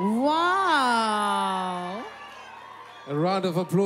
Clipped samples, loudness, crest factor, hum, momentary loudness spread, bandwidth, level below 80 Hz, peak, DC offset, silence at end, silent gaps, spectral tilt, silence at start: under 0.1%; -24 LUFS; 16 dB; none; 21 LU; 16 kHz; -70 dBFS; -10 dBFS; under 0.1%; 0 s; none; -5 dB/octave; 0 s